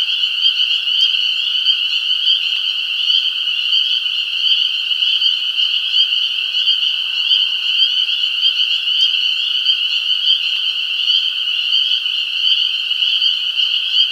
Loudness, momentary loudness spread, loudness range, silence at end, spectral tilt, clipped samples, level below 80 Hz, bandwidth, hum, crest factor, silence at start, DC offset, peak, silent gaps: -13 LUFS; 3 LU; 1 LU; 0 s; 4 dB/octave; under 0.1%; -78 dBFS; 16.5 kHz; none; 14 dB; 0 s; under 0.1%; -2 dBFS; none